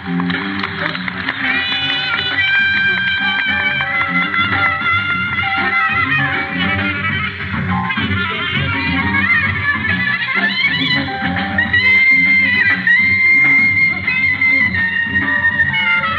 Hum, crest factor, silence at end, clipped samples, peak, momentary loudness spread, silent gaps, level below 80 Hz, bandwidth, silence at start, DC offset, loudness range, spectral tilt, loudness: none; 12 dB; 0 s; under 0.1%; -2 dBFS; 9 LU; none; -44 dBFS; 7.4 kHz; 0 s; under 0.1%; 6 LU; -6 dB/octave; -13 LUFS